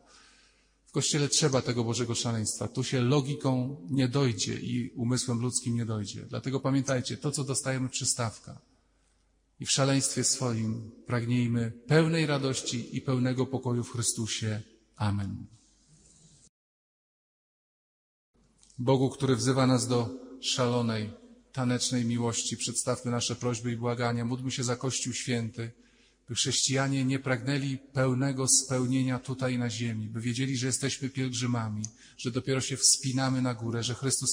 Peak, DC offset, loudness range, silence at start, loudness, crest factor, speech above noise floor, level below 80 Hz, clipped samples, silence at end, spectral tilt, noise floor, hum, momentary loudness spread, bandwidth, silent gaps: -8 dBFS; under 0.1%; 4 LU; 0.95 s; -29 LUFS; 22 dB; 40 dB; -66 dBFS; under 0.1%; 0 s; -4 dB/octave; -69 dBFS; none; 9 LU; 16 kHz; 16.49-18.33 s